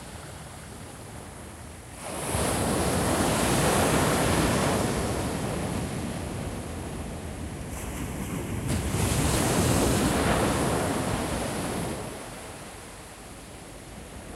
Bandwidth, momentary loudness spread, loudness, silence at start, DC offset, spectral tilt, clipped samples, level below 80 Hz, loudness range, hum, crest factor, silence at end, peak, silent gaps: 16 kHz; 18 LU; -27 LUFS; 0 s; under 0.1%; -4.5 dB/octave; under 0.1%; -40 dBFS; 8 LU; none; 18 dB; 0 s; -10 dBFS; none